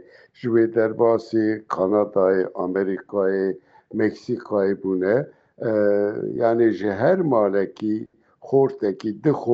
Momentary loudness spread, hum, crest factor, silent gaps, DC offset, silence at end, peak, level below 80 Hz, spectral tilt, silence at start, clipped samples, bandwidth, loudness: 8 LU; none; 14 dB; none; under 0.1%; 0 s; -8 dBFS; -68 dBFS; -9 dB/octave; 0.4 s; under 0.1%; 7.2 kHz; -22 LUFS